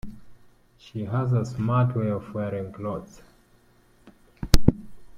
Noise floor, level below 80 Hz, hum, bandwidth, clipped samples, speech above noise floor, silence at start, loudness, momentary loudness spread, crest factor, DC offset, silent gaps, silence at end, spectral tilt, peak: -59 dBFS; -34 dBFS; none; 16 kHz; under 0.1%; 32 dB; 0.05 s; -26 LUFS; 17 LU; 24 dB; under 0.1%; none; 0 s; -7 dB/octave; 0 dBFS